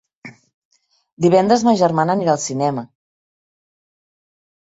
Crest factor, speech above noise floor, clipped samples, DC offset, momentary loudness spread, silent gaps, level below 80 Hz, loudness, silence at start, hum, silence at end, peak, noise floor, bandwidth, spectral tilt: 18 dB; 26 dB; under 0.1%; under 0.1%; 8 LU; 0.54-0.71 s, 1.13-1.17 s; -62 dBFS; -16 LUFS; 0.25 s; none; 1.85 s; -2 dBFS; -42 dBFS; 8 kHz; -5.5 dB/octave